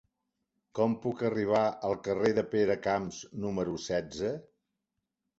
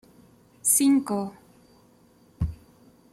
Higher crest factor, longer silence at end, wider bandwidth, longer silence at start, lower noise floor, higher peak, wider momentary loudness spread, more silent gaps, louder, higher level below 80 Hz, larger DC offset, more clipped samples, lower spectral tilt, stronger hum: about the same, 18 dB vs 20 dB; first, 1 s vs 0.6 s; second, 8 kHz vs 16 kHz; about the same, 0.75 s vs 0.65 s; first, -85 dBFS vs -58 dBFS; second, -14 dBFS vs -8 dBFS; second, 8 LU vs 14 LU; neither; second, -31 LUFS vs -24 LUFS; second, -62 dBFS vs -46 dBFS; neither; neither; first, -6 dB/octave vs -4.5 dB/octave; neither